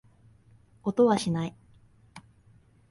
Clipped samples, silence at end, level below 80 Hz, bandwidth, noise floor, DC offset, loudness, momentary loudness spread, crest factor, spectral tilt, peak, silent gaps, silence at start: under 0.1%; 0.7 s; -64 dBFS; 11.5 kHz; -59 dBFS; under 0.1%; -27 LUFS; 12 LU; 20 dB; -6.5 dB/octave; -12 dBFS; none; 0.85 s